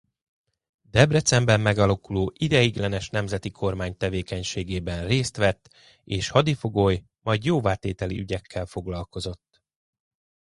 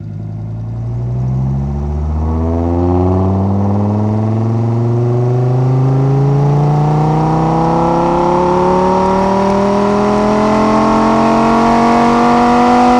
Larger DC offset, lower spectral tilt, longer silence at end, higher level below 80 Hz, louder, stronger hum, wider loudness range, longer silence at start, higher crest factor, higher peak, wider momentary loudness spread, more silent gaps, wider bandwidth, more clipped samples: neither; second, -5 dB/octave vs -8 dB/octave; first, 1.15 s vs 0 s; second, -44 dBFS vs -30 dBFS; second, -24 LUFS vs -12 LUFS; neither; about the same, 5 LU vs 4 LU; first, 0.95 s vs 0 s; first, 24 dB vs 12 dB; about the same, -2 dBFS vs 0 dBFS; first, 12 LU vs 8 LU; neither; about the same, 11.5 kHz vs 10.5 kHz; neither